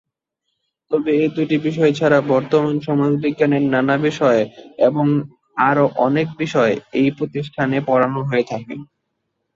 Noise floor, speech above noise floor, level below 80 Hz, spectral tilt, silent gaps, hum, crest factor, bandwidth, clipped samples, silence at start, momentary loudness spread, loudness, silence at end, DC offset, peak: -76 dBFS; 59 dB; -60 dBFS; -7.5 dB/octave; none; none; 16 dB; 7.6 kHz; under 0.1%; 0.9 s; 7 LU; -18 LUFS; 0.7 s; under 0.1%; -2 dBFS